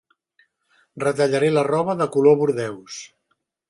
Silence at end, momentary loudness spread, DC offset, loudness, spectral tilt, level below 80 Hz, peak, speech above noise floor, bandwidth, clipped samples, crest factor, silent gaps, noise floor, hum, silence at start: 0.65 s; 17 LU; under 0.1%; -20 LUFS; -6 dB/octave; -68 dBFS; -4 dBFS; 53 dB; 11.5 kHz; under 0.1%; 18 dB; none; -72 dBFS; none; 0.95 s